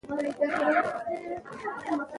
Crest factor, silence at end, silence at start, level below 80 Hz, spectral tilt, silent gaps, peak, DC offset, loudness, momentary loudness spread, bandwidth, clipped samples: 18 dB; 0 s; 0.05 s; -68 dBFS; -5.5 dB/octave; none; -12 dBFS; under 0.1%; -30 LUFS; 11 LU; 11.5 kHz; under 0.1%